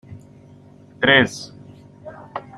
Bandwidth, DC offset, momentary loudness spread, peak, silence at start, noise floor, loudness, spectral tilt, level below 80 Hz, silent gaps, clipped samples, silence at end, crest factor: 13 kHz; under 0.1%; 26 LU; -2 dBFS; 0.1 s; -46 dBFS; -16 LUFS; -4 dB/octave; -56 dBFS; none; under 0.1%; 0.2 s; 22 dB